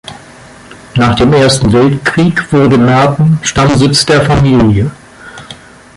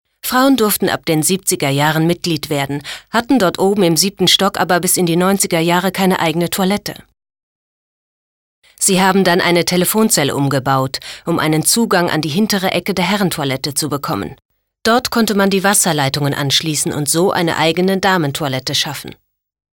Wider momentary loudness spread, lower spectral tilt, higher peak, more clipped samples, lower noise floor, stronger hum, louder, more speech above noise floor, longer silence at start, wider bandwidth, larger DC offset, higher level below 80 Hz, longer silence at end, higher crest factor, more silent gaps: about the same, 9 LU vs 7 LU; first, -5.5 dB/octave vs -3.5 dB/octave; about the same, 0 dBFS vs 0 dBFS; neither; second, -34 dBFS vs under -90 dBFS; neither; first, -8 LUFS vs -14 LUFS; second, 26 dB vs over 75 dB; second, 0.05 s vs 0.25 s; second, 11.5 kHz vs over 20 kHz; neither; first, -30 dBFS vs -50 dBFS; second, 0.45 s vs 0.65 s; second, 10 dB vs 16 dB; second, none vs 7.43-8.62 s, 14.45-14.49 s